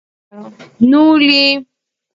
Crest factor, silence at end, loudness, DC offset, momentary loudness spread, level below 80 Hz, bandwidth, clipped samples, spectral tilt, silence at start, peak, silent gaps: 14 dB; 0.5 s; -10 LUFS; under 0.1%; 6 LU; -58 dBFS; 7.6 kHz; under 0.1%; -5 dB/octave; 0.35 s; 0 dBFS; none